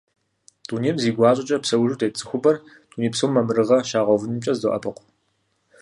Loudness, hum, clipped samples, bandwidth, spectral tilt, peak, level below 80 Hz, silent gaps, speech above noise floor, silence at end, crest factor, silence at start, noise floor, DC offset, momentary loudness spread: -21 LUFS; none; under 0.1%; 11.5 kHz; -5.5 dB/octave; -4 dBFS; -62 dBFS; none; 49 dB; 0.9 s; 18 dB; 0.7 s; -69 dBFS; under 0.1%; 9 LU